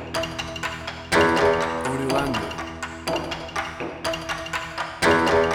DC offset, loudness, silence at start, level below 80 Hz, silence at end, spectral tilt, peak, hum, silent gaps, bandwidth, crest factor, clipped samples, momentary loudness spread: under 0.1%; -24 LUFS; 0 s; -44 dBFS; 0 s; -4 dB/octave; -6 dBFS; none; none; over 20 kHz; 18 dB; under 0.1%; 12 LU